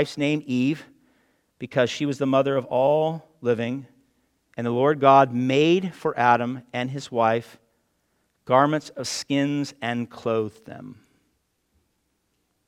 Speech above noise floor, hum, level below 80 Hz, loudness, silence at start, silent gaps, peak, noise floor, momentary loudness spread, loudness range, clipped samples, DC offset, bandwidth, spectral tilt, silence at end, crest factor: 50 dB; none; -70 dBFS; -23 LUFS; 0 s; none; -2 dBFS; -72 dBFS; 11 LU; 7 LU; under 0.1%; under 0.1%; 14 kHz; -5.5 dB/octave; 1.75 s; 22 dB